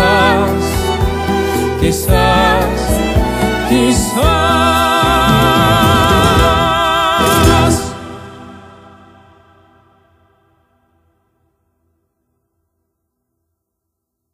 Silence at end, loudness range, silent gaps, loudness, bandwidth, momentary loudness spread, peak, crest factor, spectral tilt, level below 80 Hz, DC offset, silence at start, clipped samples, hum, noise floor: 5.75 s; 6 LU; none; -12 LUFS; 15.5 kHz; 6 LU; 0 dBFS; 14 dB; -4.5 dB/octave; -24 dBFS; under 0.1%; 0 s; under 0.1%; none; -75 dBFS